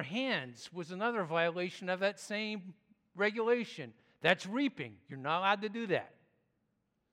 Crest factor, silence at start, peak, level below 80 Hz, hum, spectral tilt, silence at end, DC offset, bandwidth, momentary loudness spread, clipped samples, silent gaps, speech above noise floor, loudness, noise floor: 24 dB; 0 s; -12 dBFS; -86 dBFS; none; -5 dB/octave; 1.05 s; under 0.1%; 13.5 kHz; 14 LU; under 0.1%; none; 45 dB; -35 LUFS; -80 dBFS